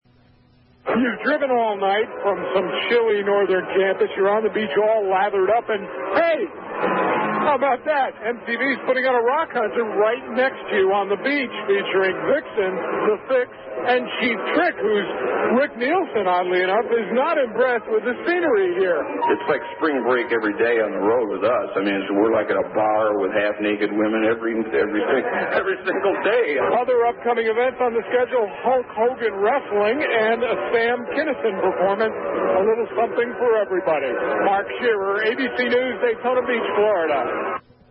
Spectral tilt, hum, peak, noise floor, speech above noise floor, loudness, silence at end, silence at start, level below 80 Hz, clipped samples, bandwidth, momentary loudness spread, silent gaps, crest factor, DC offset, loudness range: -9.5 dB/octave; none; -4 dBFS; -55 dBFS; 34 dB; -21 LUFS; 0.3 s; 0.85 s; -62 dBFS; under 0.1%; 5.6 kHz; 4 LU; none; 16 dB; under 0.1%; 1 LU